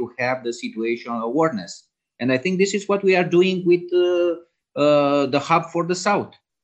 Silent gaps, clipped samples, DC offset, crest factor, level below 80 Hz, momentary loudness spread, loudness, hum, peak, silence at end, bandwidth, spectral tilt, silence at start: none; under 0.1%; under 0.1%; 18 dB; -70 dBFS; 11 LU; -20 LUFS; none; -4 dBFS; 0.35 s; 8.6 kHz; -5.5 dB/octave; 0 s